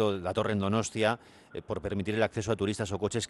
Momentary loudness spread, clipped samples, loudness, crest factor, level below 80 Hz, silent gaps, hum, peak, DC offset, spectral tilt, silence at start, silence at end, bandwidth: 9 LU; under 0.1%; -31 LUFS; 18 dB; -58 dBFS; none; none; -12 dBFS; under 0.1%; -5 dB/octave; 0 s; 0.05 s; 12 kHz